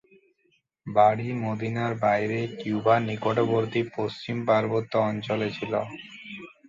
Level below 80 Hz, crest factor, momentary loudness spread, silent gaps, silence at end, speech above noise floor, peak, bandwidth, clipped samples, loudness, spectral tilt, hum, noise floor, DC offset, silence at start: -64 dBFS; 20 dB; 12 LU; none; 0.2 s; 44 dB; -6 dBFS; 7.6 kHz; under 0.1%; -26 LUFS; -7.5 dB/octave; none; -70 dBFS; under 0.1%; 0.85 s